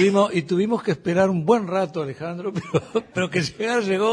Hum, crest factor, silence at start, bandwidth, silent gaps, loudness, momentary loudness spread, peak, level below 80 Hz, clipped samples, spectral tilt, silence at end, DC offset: none; 16 dB; 0 s; 10.5 kHz; none; -22 LUFS; 9 LU; -4 dBFS; -60 dBFS; under 0.1%; -6 dB/octave; 0 s; under 0.1%